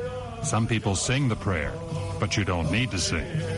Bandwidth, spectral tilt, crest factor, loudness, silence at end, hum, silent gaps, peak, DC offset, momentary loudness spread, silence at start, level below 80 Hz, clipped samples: 11.5 kHz; -4.5 dB/octave; 16 dB; -26 LUFS; 0 s; none; none; -12 dBFS; under 0.1%; 7 LU; 0 s; -42 dBFS; under 0.1%